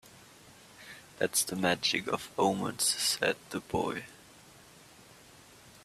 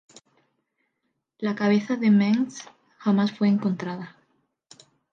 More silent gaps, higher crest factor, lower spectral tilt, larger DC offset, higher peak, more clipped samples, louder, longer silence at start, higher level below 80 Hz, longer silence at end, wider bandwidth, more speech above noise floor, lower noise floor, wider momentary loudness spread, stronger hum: neither; first, 22 dB vs 14 dB; second, -2.5 dB/octave vs -7 dB/octave; neither; about the same, -12 dBFS vs -10 dBFS; neither; second, -30 LUFS vs -24 LUFS; second, 0.05 s vs 1.4 s; first, -66 dBFS vs -74 dBFS; second, 0.05 s vs 1.05 s; first, 15.5 kHz vs 7.6 kHz; second, 24 dB vs 55 dB; second, -56 dBFS vs -78 dBFS; first, 21 LU vs 14 LU; neither